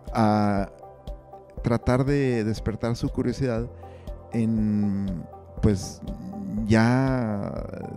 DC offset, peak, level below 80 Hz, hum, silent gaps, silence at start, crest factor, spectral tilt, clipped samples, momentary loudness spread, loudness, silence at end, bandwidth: under 0.1%; -6 dBFS; -40 dBFS; none; none; 0.05 s; 18 dB; -7.5 dB/octave; under 0.1%; 20 LU; -25 LUFS; 0 s; 12.5 kHz